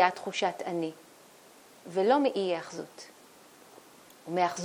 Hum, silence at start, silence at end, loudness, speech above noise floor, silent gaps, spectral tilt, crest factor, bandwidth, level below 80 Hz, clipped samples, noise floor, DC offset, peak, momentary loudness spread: none; 0 s; 0 s; -30 LUFS; 26 dB; none; -4.5 dB/octave; 24 dB; 18.5 kHz; -84 dBFS; under 0.1%; -55 dBFS; under 0.1%; -8 dBFS; 24 LU